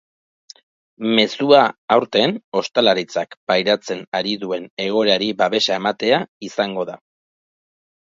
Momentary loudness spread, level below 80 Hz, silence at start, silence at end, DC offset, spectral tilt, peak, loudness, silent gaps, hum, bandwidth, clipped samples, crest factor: 11 LU; -66 dBFS; 1 s; 1.05 s; under 0.1%; -4.5 dB/octave; 0 dBFS; -18 LUFS; 1.78-1.88 s, 2.44-2.52 s, 3.37-3.47 s, 4.07-4.12 s, 4.70-4.77 s, 6.28-6.41 s; none; 7.8 kHz; under 0.1%; 20 dB